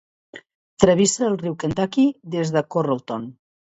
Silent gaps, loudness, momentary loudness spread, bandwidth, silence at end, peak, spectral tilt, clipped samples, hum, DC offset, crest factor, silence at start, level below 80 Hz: 0.55-0.77 s; -21 LUFS; 11 LU; 8 kHz; 0.45 s; 0 dBFS; -5 dB/octave; under 0.1%; none; under 0.1%; 22 dB; 0.35 s; -52 dBFS